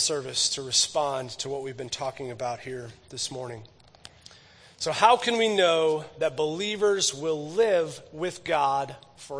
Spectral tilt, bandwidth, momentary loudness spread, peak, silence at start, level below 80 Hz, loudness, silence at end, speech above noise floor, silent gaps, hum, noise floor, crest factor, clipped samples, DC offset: -2 dB/octave; 10.5 kHz; 14 LU; -4 dBFS; 0 s; -66 dBFS; -26 LUFS; 0 s; 27 dB; none; none; -53 dBFS; 22 dB; under 0.1%; under 0.1%